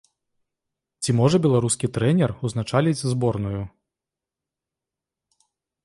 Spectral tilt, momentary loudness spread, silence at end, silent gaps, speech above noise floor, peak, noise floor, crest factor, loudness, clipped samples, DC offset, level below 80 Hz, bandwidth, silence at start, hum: -6 dB/octave; 11 LU; 2.15 s; none; 67 dB; -6 dBFS; -88 dBFS; 18 dB; -22 LUFS; under 0.1%; under 0.1%; -52 dBFS; 11.5 kHz; 1 s; none